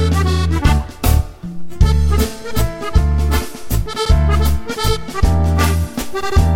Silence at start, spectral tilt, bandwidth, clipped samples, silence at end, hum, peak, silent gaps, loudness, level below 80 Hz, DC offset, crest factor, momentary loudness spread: 0 s; -5.5 dB/octave; 17 kHz; under 0.1%; 0 s; none; -2 dBFS; none; -17 LUFS; -18 dBFS; under 0.1%; 12 dB; 7 LU